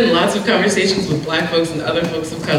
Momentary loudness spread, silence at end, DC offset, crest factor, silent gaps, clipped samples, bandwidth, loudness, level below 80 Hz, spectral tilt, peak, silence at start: 5 LU; 0 s; under 0.1%; 12 dB; none; under 0.1%; 16.5 kHz; -17 LUFS; -48 dBFS; -4.5 dB/octave; -4 dBFS; 0 s